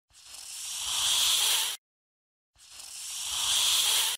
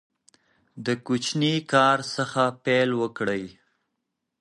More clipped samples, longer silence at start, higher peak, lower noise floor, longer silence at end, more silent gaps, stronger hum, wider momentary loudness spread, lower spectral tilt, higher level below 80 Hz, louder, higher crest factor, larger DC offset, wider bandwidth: neither; second, 0.15 s vs 0.75 s; second, -12 dBFS vs -6 dBFS; first, under -90 dBFS vs -81 dBFS; second, 0 s vs 0.9 s; first, 1.78-2.53 s vs none; neither; first, 20 LU vs 10 LU; second, 3.5 dB/octave vs -4.5 dB/octave; about the same, -64 dBFS vs -68 dBFS; about the same, -25 LUFS vs -24 LUFS; about the same, 18 dB vs 20 dB; neither; first, 16.5 kHz vs 11.5 kHz